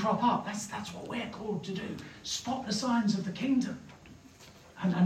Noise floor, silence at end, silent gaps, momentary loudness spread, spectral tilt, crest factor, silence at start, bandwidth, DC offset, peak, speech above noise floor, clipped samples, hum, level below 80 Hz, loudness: -54 dBFS; 0 s; none; 23 LU; -5 dB/octave; 18 dB; 0 s; 14.5 kHz; under 0.1%; -16 dBFS; 23 dB; under 0.1%; none; -66 dBFS; -33 LUFS